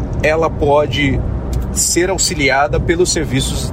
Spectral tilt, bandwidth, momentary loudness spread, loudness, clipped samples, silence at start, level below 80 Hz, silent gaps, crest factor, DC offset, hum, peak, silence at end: -4 dB/octave; 16 kHz; 6 LU; -15 LUFS; under 0.1%; 0 s; -24 dBFS; none; 14 dB; under 0.1%; none; -2 dBFS; 0 s